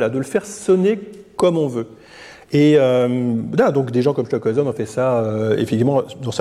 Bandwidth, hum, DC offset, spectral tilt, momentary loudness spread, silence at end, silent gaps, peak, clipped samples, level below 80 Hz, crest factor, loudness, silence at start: 13.5 kHz; none; under 0.1%; -7 dB/octave; 9 LU; 0 s; none; -4 dBFS; under 0.1%; -58 dBFS; 14 dB; -18 LUFS; 0 s